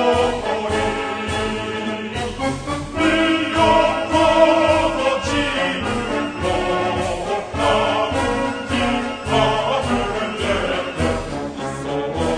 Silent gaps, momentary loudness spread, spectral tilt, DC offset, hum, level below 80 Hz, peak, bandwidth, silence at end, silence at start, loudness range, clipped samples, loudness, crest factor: none; 9 LU; -5 dB/octave; under 0.1%; none; -36 dBFS; -2 dBFS; 10.5 kHz; 0 s; 0 s; 4 LU; under 0.1%; -19 LUFS; 18 dB